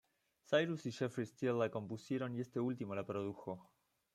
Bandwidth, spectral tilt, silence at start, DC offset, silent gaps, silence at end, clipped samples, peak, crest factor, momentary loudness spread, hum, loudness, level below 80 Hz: 13.5 kHz; -6.5 dB/octave; 0.5 s; under 0.1%; none; 0.5 s; under 0.1%; -20 dBFS; 20 dB; 9 LU; none; -40 LUFS; -82 dBFS